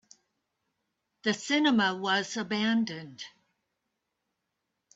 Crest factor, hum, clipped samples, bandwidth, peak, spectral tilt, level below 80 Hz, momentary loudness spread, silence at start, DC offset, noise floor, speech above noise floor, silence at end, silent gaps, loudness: 18 dB; none; under 0.1%; 8 kHz; -14 dBFS; -3.5 dB/octave; -76 dBFS; 18 LU; 1.25 s; under 0.1%; -83 dBFS; 55 dB; 1.65 s; none; -28 LUFS